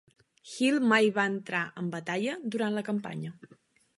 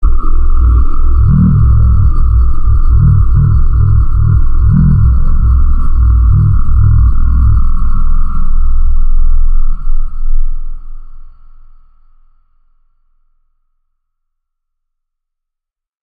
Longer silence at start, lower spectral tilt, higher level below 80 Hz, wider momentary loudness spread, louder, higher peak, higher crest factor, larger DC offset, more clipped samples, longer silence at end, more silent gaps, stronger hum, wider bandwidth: first, 0.45 s vs 0 s; second, -5 dB/octave vs -12 dB/octave; second, -80 dBFS vs -8 dBFS; first, 15 LU vs 11 LU; second, -29 LUFS vs -12 LUFS; second, -10 dBFS vs 0 dBFS; first, 20 dB vs 8 dB; neither; neither; second, 0.55 s vs 4.9 s; neither; neither; first, 11.5 kHz vs 1.6 kHz